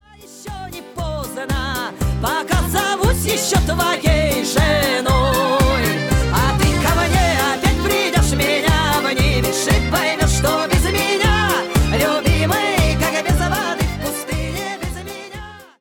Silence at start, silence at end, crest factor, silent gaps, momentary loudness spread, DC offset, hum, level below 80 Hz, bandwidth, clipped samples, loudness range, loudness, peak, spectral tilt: 0.2 s; 0.15 s; 12 dB; none; 11 LU; under 0.1%; none; -24 dBFS; 19.5 kHz; under 0.1%; 3 LU; -17 LUFS; -6 dBFS; -4.5 dB/octave